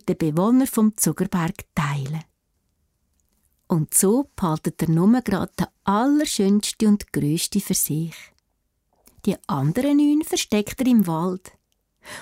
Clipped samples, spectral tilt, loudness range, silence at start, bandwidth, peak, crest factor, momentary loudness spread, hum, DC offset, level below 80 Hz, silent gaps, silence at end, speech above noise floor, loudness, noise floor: under 0.1%; -5 dB/octave; 4 LU; 0.05 s; 16 kHz; -6 dBFS; 16 dB; 9 LU; none; under 0.1%; -52 dBFS; none; 0 s; 51 dB; -21 LUFS; -72 dBFS